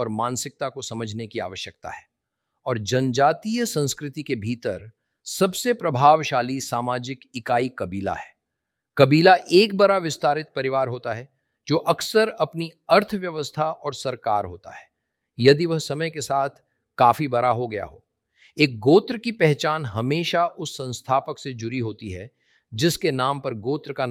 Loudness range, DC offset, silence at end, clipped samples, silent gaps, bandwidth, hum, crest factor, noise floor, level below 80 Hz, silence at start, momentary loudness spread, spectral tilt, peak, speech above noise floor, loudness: 6 LU; under 0.1%; 0 s; under 0.1%; none; 17 kHz; none; 22 dB; -82 dBFS; -62 dBFS; 0 s; 15 LU; -5 dB/octave; -2 dBFS; 60 dB; -22 LUFS